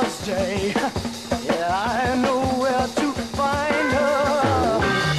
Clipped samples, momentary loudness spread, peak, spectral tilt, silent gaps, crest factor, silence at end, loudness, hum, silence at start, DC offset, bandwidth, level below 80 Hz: under 0.1%; 5 LU; -6 dBFS; -5 dB/octave; none; 14 dB; 0 s; -22 LUFS; none; 0 s; 0.1%; 13.5 kHz; -42 dBFS